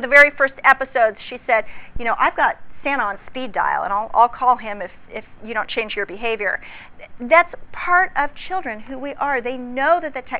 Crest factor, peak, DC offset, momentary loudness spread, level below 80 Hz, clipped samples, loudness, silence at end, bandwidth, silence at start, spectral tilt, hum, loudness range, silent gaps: 20 dB; 0 dBFS; under 0.1%; 15 LU; -48 dBFS; under 0.1%; -19 LUFS; 0 s; 4 kHz; 0 s; -6.5 dB/octave; none; 3 LU; none